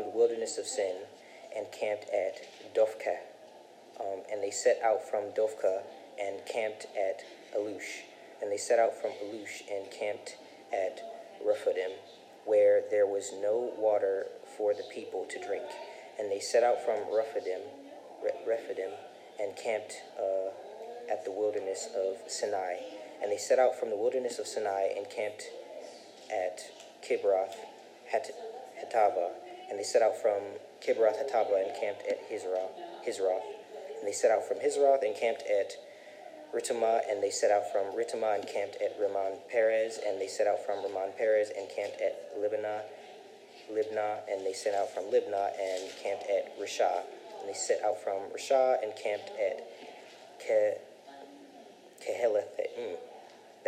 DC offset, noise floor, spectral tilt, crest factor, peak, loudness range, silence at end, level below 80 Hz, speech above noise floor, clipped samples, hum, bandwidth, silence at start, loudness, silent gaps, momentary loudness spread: under 0.1%; -54 dBFS; -2 dB/octave; 20 dB; -12 dBFS; 5 LU; 0 s; under -90 dBFS; 22 dB; under 0.1%; none; 14.5 kHz; 0 s; -32 LUFS; none; 17 LU